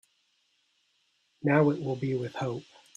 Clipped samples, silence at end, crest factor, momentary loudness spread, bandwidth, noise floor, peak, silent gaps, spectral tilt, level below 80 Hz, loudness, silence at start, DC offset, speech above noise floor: under 0.1%; 0.35 s; 22 dB; 11 LU; 9.8 kHz; -72 dBFS; -10 dBFS; none; -8 dB/octave; -72 dBFS; -29 LUFS; 1.45 s; under 0.1%; 45 dB